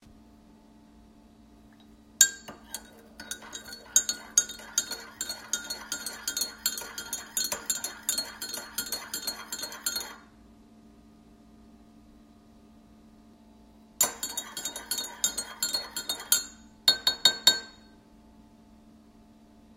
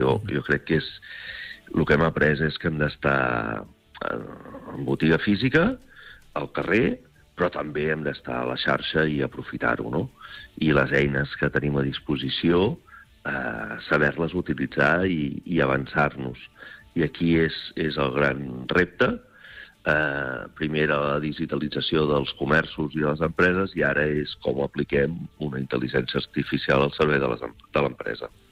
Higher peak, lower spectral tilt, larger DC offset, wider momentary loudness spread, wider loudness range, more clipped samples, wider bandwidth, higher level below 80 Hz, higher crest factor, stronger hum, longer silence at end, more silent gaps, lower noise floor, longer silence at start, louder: first, -2 dBFS vs -10 dBFS; second, 1.5 dB/octave vs -7.5 dB/octave; neither; first, 18 LU vs 13 LU; first, 10 LU vs 2 LU; neither; first, 16.5 kHz vs 10 kHz; second, -62 dBFS vs -46 dBFS; first, 32 dB vs 16 dB; neither; second, 0 s vs 0.25 s; neither; first, -56 dBFS vs -46 dBFS; about the same, 0.05 s vs 0 s; second, -28 LUFS vs -24 LUFS